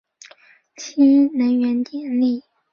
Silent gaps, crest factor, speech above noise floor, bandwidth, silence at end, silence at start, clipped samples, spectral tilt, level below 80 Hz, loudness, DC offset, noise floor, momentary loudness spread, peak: none; 14 dB; 34 dB; 7 kHz; 0.35 s; 0.8 s; under 0.1%; -5 dB/octave; -68 dBFS; -18 LUFS; under 0.1%; -51 dBFS; 15 LU; -6 dBFS